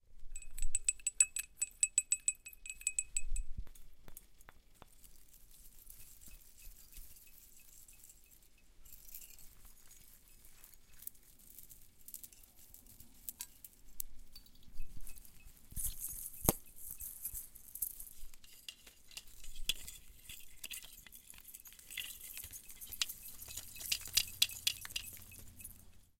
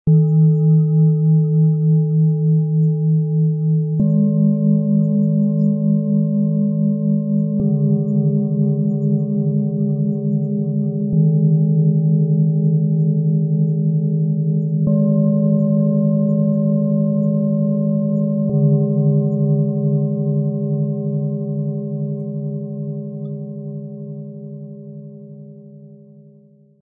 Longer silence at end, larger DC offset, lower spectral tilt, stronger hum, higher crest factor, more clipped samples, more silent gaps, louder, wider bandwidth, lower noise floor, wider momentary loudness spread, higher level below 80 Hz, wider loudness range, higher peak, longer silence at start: second, 0.15 s vs 0.9 s; neither; second, -0.5 dB/octave vs -17 dB/octave; neither; first, 34 dB vs 10 dB; neither; neither; second, -39 LUFS vs -17 LUFS; first, 17 kHz vs 1.1 kHz; first, -62 dBFS vs -49 dBFS; first, 25 LU vs 11 LU; first, -50 dBFS vs -56 dBFS; first, 21 LU vs 10 LU; about the same, -8 dBFS vs -6 dBFS; about the same, 0.1 s vs 0.05 s